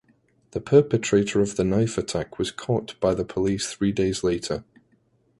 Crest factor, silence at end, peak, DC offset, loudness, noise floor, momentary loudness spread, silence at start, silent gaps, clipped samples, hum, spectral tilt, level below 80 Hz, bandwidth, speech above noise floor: 20 dB; 0.8 s; -4 dBFS; under 0.1%; -24 LUFS; -64 dBFS; 10 LU; 0.55 s; none; under 0.1%; none; -5.5 dB/octave; -48 dBFS; 11.5 kHz; 41 dB